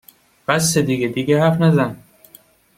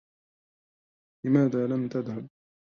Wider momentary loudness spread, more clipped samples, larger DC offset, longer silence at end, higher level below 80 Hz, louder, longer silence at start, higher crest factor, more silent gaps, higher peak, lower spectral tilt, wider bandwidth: second, 7 LU vs 15 LU; neither; neither; first, 0.8 s vs 0.4 s; first, -54 dBFS vs -72 dBFS; first, -17 LUFS vs -27 LUFS; second, 0.5 s vs 1.25 s; about the same, 16 dB vs 20 dB; neither; first, -2 dBFS vs -10 dBFS; second, -5 dB/octave vs -9.5 dB/octave; first, 16 kHz vs 6.8 kHz